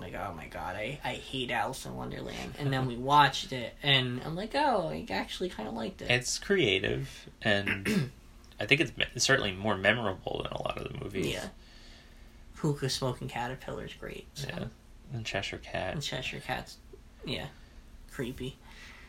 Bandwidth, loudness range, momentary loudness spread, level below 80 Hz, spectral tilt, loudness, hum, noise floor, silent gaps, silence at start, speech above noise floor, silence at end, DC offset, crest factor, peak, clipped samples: 16 kHz; 8 LU; 15 LU; -52 dBFS; -4 dB/octave; -31 LUFS; none; -52 dBFS; none; 0 s; 20 dB; 0 s; under 0.1%; 26 dB; -8 dBFS; under 0.1%